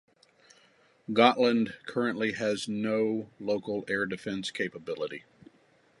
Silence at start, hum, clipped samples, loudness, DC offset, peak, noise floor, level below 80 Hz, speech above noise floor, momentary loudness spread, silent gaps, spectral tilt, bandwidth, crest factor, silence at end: 1.1 s; none; under 0.1%; -29 LUFS; under 0.1%; -6 dBFS; -64 dBFS; -72 dBFS; 35 dB; 12 LU; none; -5 dB/octave; 11.5 kHz; 26 dB; 0.8 s